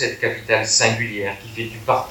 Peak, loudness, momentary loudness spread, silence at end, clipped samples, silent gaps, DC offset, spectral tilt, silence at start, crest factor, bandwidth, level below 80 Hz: -2 dBFS; -20 LUFS; 12 LU; 0 s; under 0.1%; none; under 0.1%; -2.5 dB/octave; 0 s; 20 dB; 18 kHz; -54 dBFS